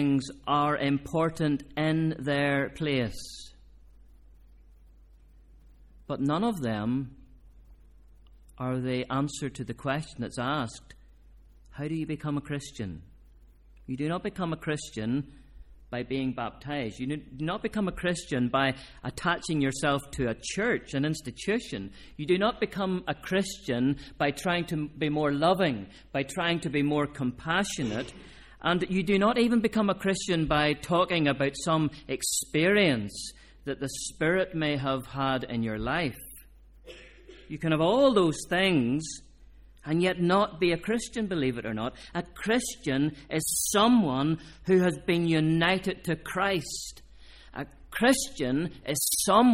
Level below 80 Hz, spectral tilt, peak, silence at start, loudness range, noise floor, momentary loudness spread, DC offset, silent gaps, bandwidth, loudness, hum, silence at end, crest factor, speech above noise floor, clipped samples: -52 dBFS; -4.5 dB/octave; -8 dBFS; 0 s; 8 LU; -55 dBFS; 13 LU; under 0.1%; none; 16.5 kHz; -28 LUFS; none; 0 s; 20 dB; 27 dB; under 0.1%